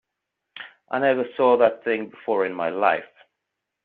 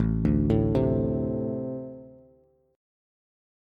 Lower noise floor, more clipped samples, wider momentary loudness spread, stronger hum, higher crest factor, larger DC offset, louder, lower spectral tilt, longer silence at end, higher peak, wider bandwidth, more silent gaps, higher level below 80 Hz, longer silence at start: first, -82 dBFS vs -61 dBFS; neither; about the same, 16 LU vs 15 LU; neither; about the same, 20 dB vs 18 dB; neither; first, -22 LUFS vs -26 LUFS; second, -3 dB/octave vs -11 dB/octave; second, 0.8 s vs 1.6 s; first, -4 dBFS vs -10 dBFS; second, 4.4 kHz vs 5 kHz; neither; second, -72 dBFS vs -38 dBFS; first, 0.55 s vs 0 s